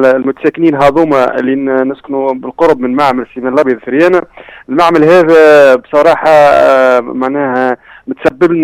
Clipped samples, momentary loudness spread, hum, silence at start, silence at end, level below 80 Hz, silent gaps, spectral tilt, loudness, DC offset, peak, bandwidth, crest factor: 0.3%; 10 LU; none; 0 s; 0 s; -44 dBFS; none; -6.5 dB/octave; -9 LUFS; under 0.1%; 0 dBFS; 15 kHz; 8 dB